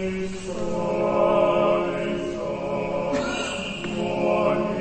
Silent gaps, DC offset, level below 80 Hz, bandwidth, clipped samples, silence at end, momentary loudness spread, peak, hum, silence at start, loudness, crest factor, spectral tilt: none; under 0.1%; -46 dBFS; 8.8 kHz; under 0.1%; 0 s; 9 LU; -8 dBFS; none; 0 s; -24 LUFS; 16 dB; -5.5 dB/octave